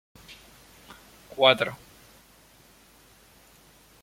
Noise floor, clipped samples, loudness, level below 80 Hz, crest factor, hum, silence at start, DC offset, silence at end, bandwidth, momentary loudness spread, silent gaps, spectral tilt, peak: -56 dBFS; under 0.1%; -22 LUFS; -64 dBFS; 28 dB; none; 1.35 s; under 0.1%; 2.3 s; 16.5 kHz; 29 LU; none; -3.5 dB/octave; -4 dBFS